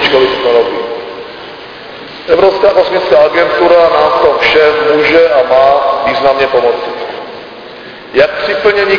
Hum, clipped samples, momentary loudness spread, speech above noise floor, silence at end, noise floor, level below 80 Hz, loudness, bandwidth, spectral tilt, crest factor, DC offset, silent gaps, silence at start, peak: none; 0.7%; 20 LU; 21 dB; 0 s; -28 dBFS; -42 dBFS; -9 LUFS; 5.4 kHz; -5 dB/octave; 10 dB; under 0.1%; none; 0 s; 0 dBFS